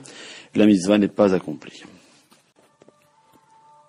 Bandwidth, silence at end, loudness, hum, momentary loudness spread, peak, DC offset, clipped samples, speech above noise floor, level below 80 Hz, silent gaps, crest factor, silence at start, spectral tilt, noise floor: 11.5 kHz; 2.2 s; -19 LUFS; none; 22 LU; -4 dBFS; under 0.1%; under 0.1%; 39 dB; -64 dBFS; none; 20 dB; 0.2 s; -6 dB/octave; -57 dBFS